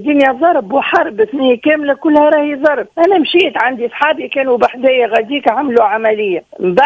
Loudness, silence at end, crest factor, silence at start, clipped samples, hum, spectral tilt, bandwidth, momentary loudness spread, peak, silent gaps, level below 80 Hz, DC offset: -12 LUFS; 0 s; 12 dB; 0 s; 0.2%; none; -6 dB/octave; 8 kHz; 5 LU; 0 dBFS; none; -56 dBFS; under 0.1%